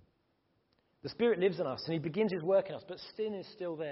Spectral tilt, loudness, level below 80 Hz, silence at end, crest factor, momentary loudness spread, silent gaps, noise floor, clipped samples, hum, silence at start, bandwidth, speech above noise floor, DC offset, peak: -5 dB/octave; -34 LUFS; -74 dBFS; 0 s; 18 dB; 15 LU; none; -76 dBFS; under 0.1%; none; 1.05 s; 5.8 kHz; 43 dB; under 0.1%; -18 dBFS